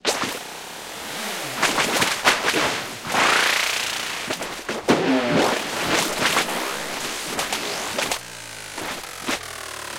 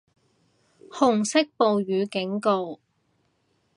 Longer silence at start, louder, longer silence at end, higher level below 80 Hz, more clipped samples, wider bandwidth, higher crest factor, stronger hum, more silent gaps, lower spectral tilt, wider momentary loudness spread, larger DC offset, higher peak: second, 0.05 s vs 0.9 s; about the same, -22 LUFS vs -24 LUFS; second, 0 s vs 1 s; first, -54 dBFS vs -72 dBFS; neither; first, 17 kHz vs 11 kHz; about the same, 24 dB vs 20 dB; neither; neither; second, -2 dB/octave vs -4.5 dB/octave; about the same, 13 LU vs 14 LU; neither; first, 0 dBFS vs -6 dBFS